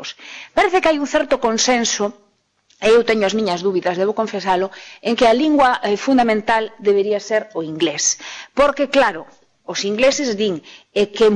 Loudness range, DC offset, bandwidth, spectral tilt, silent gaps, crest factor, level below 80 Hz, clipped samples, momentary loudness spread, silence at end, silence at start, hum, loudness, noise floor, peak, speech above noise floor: 2 LU; under 0.1%; 10.5 kHz; -3 dB/octave; none; 12 dB; -50 dBFS; under 0.1%; 11 LU; 0 s; 0 s; none; -17 LUFS; -59 dBFS; -6 dBFS; 42 dB